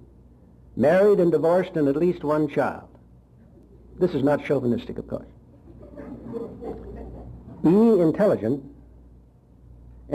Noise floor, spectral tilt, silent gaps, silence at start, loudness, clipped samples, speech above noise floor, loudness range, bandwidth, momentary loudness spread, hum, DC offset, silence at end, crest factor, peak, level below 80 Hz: -52 dBFS; -8.5 dB/octave; none; 0.75 s; -22 LUFS; under 0.1%; 31 dB; 6 LU; 13 kHz; 22 LU; none; under 0.1%; 0 s; 14 dB; -10 dBFS; -50 dBFS